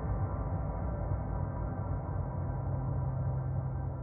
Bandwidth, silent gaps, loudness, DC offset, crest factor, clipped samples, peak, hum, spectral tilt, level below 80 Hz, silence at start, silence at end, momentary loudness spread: 2.4 kHz; none; -36 LUFS; under 0.1%; 12 dB; under 0.1%; -22 dBFS; none; -8.5 dB/octave; -40 dBFS; 0 s; 0 s; 3 LU